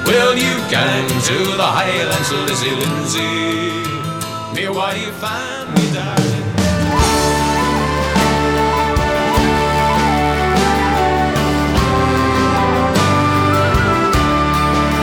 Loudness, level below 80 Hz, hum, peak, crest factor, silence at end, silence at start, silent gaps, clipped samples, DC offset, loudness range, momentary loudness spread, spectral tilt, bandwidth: -15 LUFS; -28 dBFS; none; -2 dBFS; 12 dB; 0 s; 0 s; none; under 0.1%; under 0.1%; 5 LU; 6 LU; -4.5 dB/octave; 18 kHz